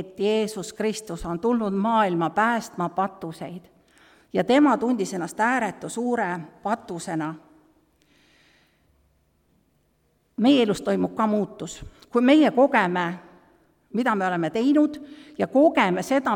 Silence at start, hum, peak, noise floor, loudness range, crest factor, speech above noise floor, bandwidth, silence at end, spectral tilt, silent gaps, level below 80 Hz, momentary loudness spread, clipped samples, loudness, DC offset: 0 s; none; -6 dBFS; -67 dBFS; 9 LU; 18 dB; 44 dB; 16 kHz; 0 s; -5.5 dB/octave; none; -56 dBFS; 16 LU; under 0.1%; -23 LUFS; under 0.1%